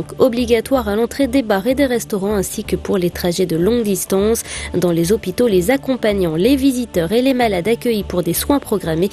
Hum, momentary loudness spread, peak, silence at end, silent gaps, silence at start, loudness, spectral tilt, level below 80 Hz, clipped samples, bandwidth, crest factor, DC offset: none; 5 LU; 0 dBFS; 0 s; none; 0 s; -17 LUFS; -5 dB/octave; -36 dBFS; under 0.1%; 14.5 kHz; 16 dB; under 0.1%